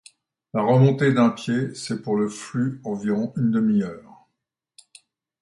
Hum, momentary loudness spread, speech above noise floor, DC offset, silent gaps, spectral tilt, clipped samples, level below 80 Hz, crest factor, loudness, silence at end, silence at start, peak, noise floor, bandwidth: none; 11 LU; 59 dB; under 0.1%; none; -7 dB/octave; under 0.1%; -64 dBFS; 18 dB; -22 LUFS; 1.4 s; 0.55 s; -6 dBFS; -80 dBFS; 11.5 kHz